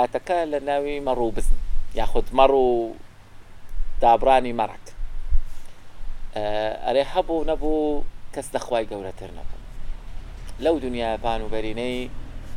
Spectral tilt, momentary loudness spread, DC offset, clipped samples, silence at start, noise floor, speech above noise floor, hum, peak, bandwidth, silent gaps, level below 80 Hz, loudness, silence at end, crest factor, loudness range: -5.5 dB/octave; 22 LU; under 0.1%; under 0.1%; 0 s; -41 dBFS; 20 dB; none; -2 dBFS; 10.5 kHz; none; -28 dBFS; -24 LUFS; 0 s; 20 dB; 7 LU